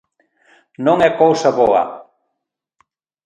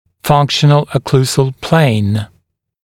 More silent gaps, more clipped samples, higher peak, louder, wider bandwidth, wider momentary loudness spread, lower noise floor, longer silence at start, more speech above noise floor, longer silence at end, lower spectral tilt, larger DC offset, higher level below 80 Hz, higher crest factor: neither; neither; about the same, 0 dBFS vs 0 dBFS; about the same, -15 LUFS vs -13 LUFS; second, 9 kHz vs 16 kHz; first, 11 LU vs 7 LU; first, -78 dBFS vs -59 dBFS; first, 0.8 s vs 0.25 s; first, 64 dB vs 47 dB; first, 1.25 s vs 0.6 s; about the same, -5.5 dB/octave vs -6 dB/octave; neither; second, -56 dBFS vs -46 dBFS; about the same, 18 dB vs 14 dB